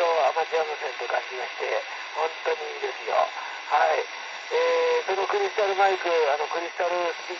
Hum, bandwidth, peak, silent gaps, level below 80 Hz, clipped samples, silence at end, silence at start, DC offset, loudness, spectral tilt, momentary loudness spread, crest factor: none; 7.4 kHz; -8 dBFS; none; under -90 dBFS; under 0.1%; 0 s; 0 s; under 0.1%; -26 LUFS; -0.5 dB/octave; 8 LU; 18 dB